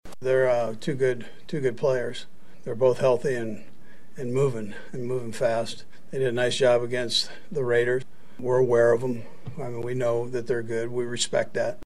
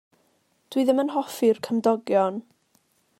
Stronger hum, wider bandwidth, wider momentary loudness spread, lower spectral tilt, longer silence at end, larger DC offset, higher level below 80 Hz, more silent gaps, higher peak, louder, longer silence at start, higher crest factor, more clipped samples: neither; second, 13 kHz vs 16 kHz; first, 14 LU vs 6 LU; about the same, -5 dB/octave vs -5.5 dB/octave; second, 0 s vs 0.8 s; first, 2% vs under 0.1%; first, -60 dBFS vs -78 dBFS; neither; about the same, -8 dBFS vs -8 dBFS; about the same, -26 LUFS vs -24 LUFS; second, 0 s vs 0.7 s; about the same, 18 dB vs 18 dB; neither